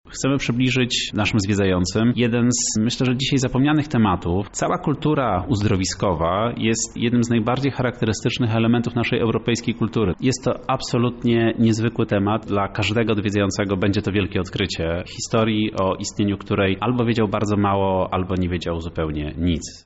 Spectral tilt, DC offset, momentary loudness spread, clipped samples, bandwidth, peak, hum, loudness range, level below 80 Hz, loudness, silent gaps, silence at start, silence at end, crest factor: -5.5 dB/octave; under 0.1%; 5 LU; under 0.1%; 8.2 kHz; -8 dBFS; none; 2 LU; -42 dBFS; -21 LUFS; none; 0.05 s; 0.05 s; 12 dB